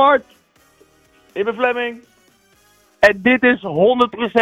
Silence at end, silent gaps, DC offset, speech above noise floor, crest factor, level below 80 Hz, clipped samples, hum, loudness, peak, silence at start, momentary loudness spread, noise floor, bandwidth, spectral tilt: 0 s; none; under 0.1%; 40 dB; 16 dB; -54 dBFS; under 0.1%; none; -16 LUFS; -2 dBFS; 0 s; 10 LU; -55 dBFS; 13 kHz; -5.5 dB/octave